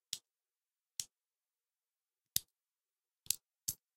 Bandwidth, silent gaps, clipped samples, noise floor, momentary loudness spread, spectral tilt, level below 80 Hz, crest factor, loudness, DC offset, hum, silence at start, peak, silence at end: 16 kHz; none; under 0.1%; under -90 dBFS; 7 LU; 1 dB/octave; -76 dBFS; 38 dB; -41 LUFS; under 0.1%; none; 0.1 s; -10 dBFS; 0.2 s